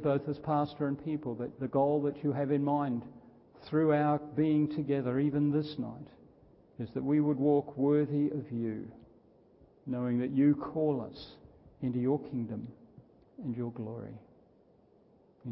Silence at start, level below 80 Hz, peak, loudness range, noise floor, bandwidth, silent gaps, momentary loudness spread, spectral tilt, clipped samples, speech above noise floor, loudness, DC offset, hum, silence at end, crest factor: 0 s; -66 dBFS; -16 dBFS; 7 LU; -64 dBFS; 5.8 kHz; none; 16 LU; -12 dB/octave; under 0.1%; 33 dB; -32 LUFS; under 0.1%; none; 0 s; 16 dB